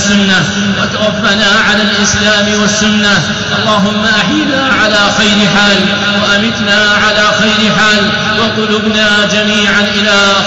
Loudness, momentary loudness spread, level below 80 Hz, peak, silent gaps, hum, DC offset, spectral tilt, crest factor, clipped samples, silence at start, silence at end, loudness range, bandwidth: -8 LUFS; 4 LU; -36 dBFS; 0 dBFS; none; none; 0.6%; -3 dB/octave; 8 dB; under 0.1%; 0 s; 0 s; 1 LU; 8.2 kHz